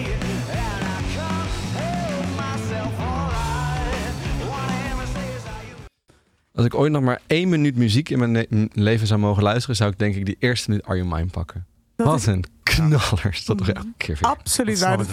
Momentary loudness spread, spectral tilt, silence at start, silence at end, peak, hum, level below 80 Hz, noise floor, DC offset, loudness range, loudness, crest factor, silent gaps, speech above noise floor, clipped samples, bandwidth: 9 LU; -5.5 dB/octave; 0 s; 0 s; -6 dBFS; none; -34 dBFS; -59 dBFS; under 0.1%; 6 LU; -22 LUFS; 16 dB; none; 39 dB; under 0.1%; 15.5 kHz